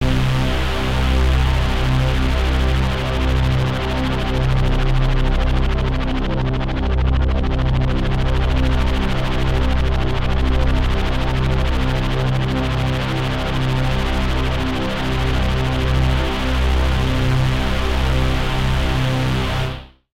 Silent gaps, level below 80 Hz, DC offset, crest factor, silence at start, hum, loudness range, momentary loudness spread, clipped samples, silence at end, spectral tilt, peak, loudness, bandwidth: none; -20 dBFS; 0.6%; 12 dB; 0 s; none; 1 LU; 3 LU; under 0.1%; 0.25 s; -6.5 dB/octave; -6 dBFS; -20 LUFS; 13 kHz